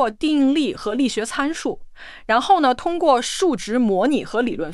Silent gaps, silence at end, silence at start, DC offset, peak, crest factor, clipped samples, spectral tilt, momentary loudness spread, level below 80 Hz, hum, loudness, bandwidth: none; 0 s; 0 s; under 0.1%; -4 dBFS; 14 dB; under 0.1%; -4 dB/octave; 7 LU; -48 dBFS; none; -20 LUFS; 12 kHz